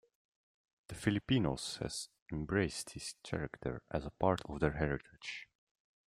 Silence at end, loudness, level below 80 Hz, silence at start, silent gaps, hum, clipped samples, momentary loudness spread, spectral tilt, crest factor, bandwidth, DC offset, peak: 0.7 s; -38 LUFS; -56 dBFS; 0.9 s; 2.22-2.26 s; none; under 0.1%; 12 LU; -5 dB/octave; 24 dB; 15.5 kHz; under 0.1%; -16 dBFS